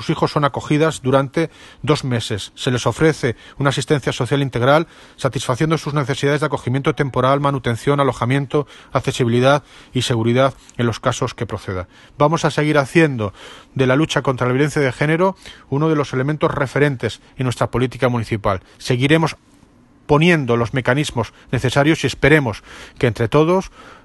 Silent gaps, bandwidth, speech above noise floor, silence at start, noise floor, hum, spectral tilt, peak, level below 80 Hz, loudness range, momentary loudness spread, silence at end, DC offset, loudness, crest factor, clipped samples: none; 12.5 kHz; 32 dB; 0 s; -50 dBFS; none; -6 dB/octave; 0 dBFS; -44 dBFS; 2 LU; 10 LU; 0.1 s; under 0.1%; -18 LUFS; 18 dB; under 0.1%